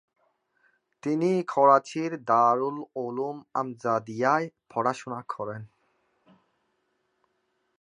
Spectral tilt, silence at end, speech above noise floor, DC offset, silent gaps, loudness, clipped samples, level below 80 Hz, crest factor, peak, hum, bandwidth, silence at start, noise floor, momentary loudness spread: -6.5 dB/octave; 2.15 s; 49 dB; under 0.1%; none; -26 LUFS; under 0.1%; -78 dBFS; 22 dB; -6 dBFS; none; 10.5 kHz; 1.05 s; -75 dBFS; 14 LU